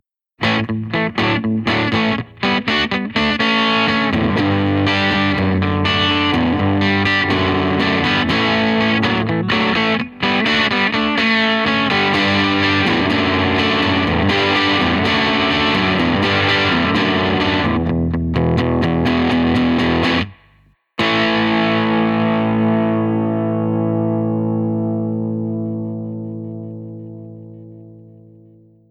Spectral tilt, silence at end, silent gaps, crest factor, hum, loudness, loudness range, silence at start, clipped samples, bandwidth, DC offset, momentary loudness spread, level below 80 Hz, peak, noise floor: -6 dB/octave; 0.8 s; none; 14 dB; 50 Hz at -45 dBFS; -16 LUFS; 6 LU; 0.4 s; under 0.1%; 9 kHz; under 0.1%; 6 LU; -42 dBFS; -2 dBFS; -54 dBFS